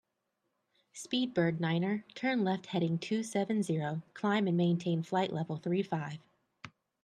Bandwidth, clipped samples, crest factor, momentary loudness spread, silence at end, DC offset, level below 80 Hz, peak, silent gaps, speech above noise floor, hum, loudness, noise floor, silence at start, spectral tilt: 11 kHz; under 0.1%; 16 dB; 18 LU; 0.35 s; under 0.1%; -78 dBFS; -16 dBFS; none; 50 dB; none; -33 LUFS; -83 dBFS; 0.95 s; -6.5 dB/octave